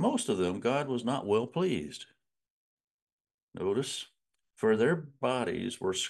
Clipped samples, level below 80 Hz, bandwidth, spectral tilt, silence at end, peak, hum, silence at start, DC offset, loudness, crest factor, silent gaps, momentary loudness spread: under 0.1%; -72 dBFS; 12.5 kHz; -5 dB/octave; 0 s; -14 dBFS; none; 0 s; under 0.1%; -31 LUFS; 18 dB; 2.50-2.77 s, 2.84-3.25 s, 3.34-3.48 s; 14 LU